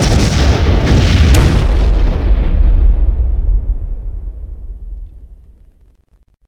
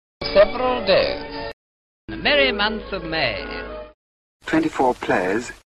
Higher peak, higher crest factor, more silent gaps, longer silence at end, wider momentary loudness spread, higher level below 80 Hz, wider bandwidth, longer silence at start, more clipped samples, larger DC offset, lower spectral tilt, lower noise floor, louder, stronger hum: first, 0 dBFS vs -4 dBFS; second, 12 dB vs 18 dB; second, none vs 1.53-2.08 s, 3.94-4.40 s; first, 1.15 s vs 0.2 s; first, 21 LU vs 16 LU; first, -12 dBFS vs -42 dBFS; first, 13.5 kHz vs 12 kHz; second, 0 s vs 0.2 s; neither; neither; first, -6 dB/octave vs -4.5 dB/octave; second, -51 dBFS vs under -90 dBFS; first, -13 LUFS vs -20 LUFS; neither